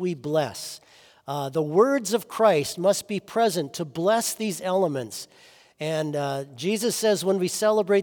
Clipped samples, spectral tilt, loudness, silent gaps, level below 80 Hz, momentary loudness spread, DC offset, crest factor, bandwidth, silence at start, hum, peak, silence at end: under 0.1%; -4.5 dB/octave; -24 LUFS; none; -72 dBFS; 13 LU; under 0.1%; 18 dB; over 20 kHz; 0 s; none; -6 dBFS; 0 s